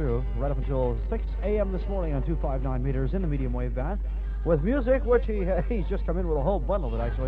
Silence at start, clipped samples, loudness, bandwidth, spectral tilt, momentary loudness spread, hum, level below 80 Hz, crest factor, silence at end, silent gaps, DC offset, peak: 0 s; under 0.1%; -28 LUFS; 4.1 kHz; -10.5 dB/octave; 6 LU; none; -28 dBFS; 16 dB; 0 s; none; under 0.1%; -10 dBFS